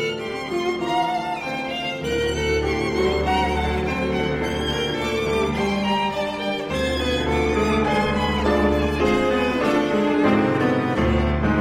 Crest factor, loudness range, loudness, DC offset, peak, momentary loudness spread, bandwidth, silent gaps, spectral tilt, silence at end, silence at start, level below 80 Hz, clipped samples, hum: 16 dB; 3 LU; -21 LUFS; under 0.1%; -6 dBFS; 6 LU; 16 kHz; none; -5.5 dB/octave; 0 s; 0 s; -34 dBFS; under 0.1%; none